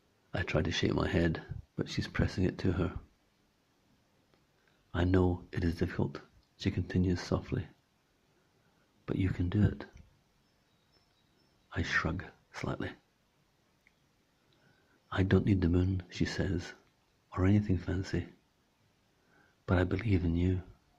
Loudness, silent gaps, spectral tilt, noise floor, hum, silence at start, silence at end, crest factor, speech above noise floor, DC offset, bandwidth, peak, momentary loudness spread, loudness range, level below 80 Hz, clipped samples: -33 LUFS; none; -7 dB/octave; -72 dBFS; none; 0.35 s; 0.25 s; 22 dB; 41 dB; under 0.1%; 8 kHz; -12 dBFS; 14 LU; 6 LU; -54 dBFS; under 0.1%